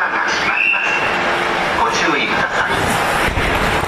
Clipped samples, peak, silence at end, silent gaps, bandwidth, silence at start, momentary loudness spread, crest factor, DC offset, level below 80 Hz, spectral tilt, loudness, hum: under 0.1%; -4 dBFS; 0 s; none; 14 kHz; 0 s; 3 LU; 12 dB; under 0.1%; -34 dBFS; -3.5 dB/octave; -15 LUFS; none